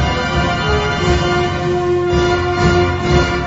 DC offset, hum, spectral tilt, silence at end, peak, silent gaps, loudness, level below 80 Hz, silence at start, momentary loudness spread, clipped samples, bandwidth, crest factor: under 0.1%; none; -6 dB/octave; 0 s; -2 dBFS; none; -15 LUFS; -24 dBFS; 0 s; 3 LU; under 0.1%; 8 kHz; 14 dB